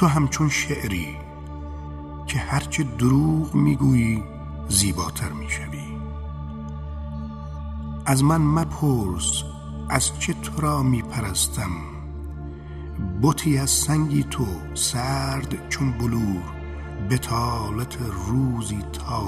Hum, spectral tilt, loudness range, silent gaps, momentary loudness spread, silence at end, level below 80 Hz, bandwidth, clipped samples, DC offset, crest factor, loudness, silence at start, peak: none; -5 dB/octave; 4 LU; none; 15 LU; 0 s; -36 dBFS; 15 kHz; under 0.1%; under 0.1%; 20 dB; -24 LUFS; 0 s; -4 dBFS